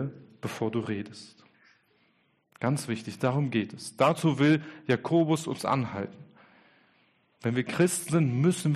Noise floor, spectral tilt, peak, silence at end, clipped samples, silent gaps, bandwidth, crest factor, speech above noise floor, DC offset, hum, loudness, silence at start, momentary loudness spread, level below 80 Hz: -69 dBFS; -6 dB/octave; -12 dBFS; 0 s; under 0.1%; none; 13 kHz; 18 dB; 42 dB; under 0.1%; none; -28 LUFS; 0 s; 13 LU; -70 dBFS